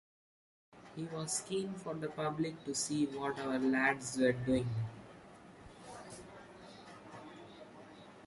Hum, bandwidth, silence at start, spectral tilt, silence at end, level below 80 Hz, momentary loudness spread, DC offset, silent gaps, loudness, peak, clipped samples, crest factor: none; 11.5 kHz; 0.75 s; -4.5 dB/octave; 0 s; -66 dBFS; 22 LU; under 0.1%; none; -36 LUFS; -18 dBFS; under 0.1%; 22 dB